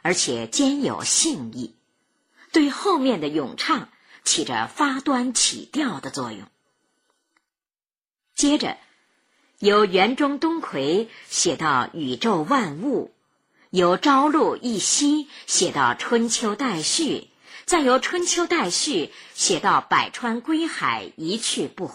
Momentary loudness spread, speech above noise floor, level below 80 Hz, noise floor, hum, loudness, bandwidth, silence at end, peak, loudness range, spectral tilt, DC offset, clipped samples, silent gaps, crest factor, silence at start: 9 LU; over 68 dB; -62 dBFS; under -90 dBFS; none; -21 LUFS; 15.5 kHz; 0 s; -4 dBFS; 5 LU; -2.5 dB/octave; under 0.1%; under 0.1%; none; 18 dB; 0.05 s